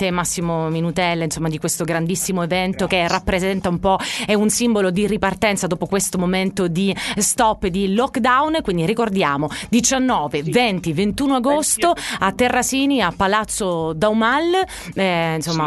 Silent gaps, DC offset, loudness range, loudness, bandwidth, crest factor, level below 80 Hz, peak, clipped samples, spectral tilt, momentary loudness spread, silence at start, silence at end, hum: none; under 0.1%; 2 LU; -19 LUFS; 12.5 kHz; 18 dB; -42 dBFS; -2 dBFS; under 0.1%; -4 dB/octave; 5 LU; 0 s; 0 s; none